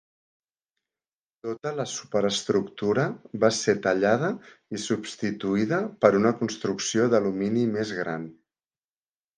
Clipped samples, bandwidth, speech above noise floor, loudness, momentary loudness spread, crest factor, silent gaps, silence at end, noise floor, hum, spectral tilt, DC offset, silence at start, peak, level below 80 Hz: under 0.1%; 10 kHz; over 65 dB; -25 LUFS; 11 LU; 24 dB; none; 1.05 s; under -90 dBFS; none; -5 dB/octave; under 0.1%; 1.45 s; -2 dBFS; -66 dBFS